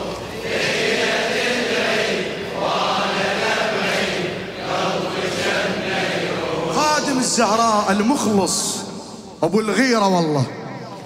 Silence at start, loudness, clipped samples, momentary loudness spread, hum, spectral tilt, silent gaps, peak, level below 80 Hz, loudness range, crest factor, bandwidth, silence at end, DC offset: 0 s; -19 LUFS; under 0.1%; 9 LU; none; -3.5 dB/octave; none; -4 dBFS; -52 dBFS; 2 LU; 16 dB; 16 kHz; 0 s; under 0.1%